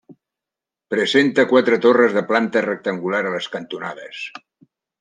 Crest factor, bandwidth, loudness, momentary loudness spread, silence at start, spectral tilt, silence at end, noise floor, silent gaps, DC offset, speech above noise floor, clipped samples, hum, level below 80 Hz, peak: 18 dB; 9.6 kHz; -18 LUFS; 16 LU; 0.1 s; -5 dB/octave; 0.6 s; -87 dBFS; none; under 0.1%; 69 dB; under 0.1%; none; -70 dBFS; -2 dBFS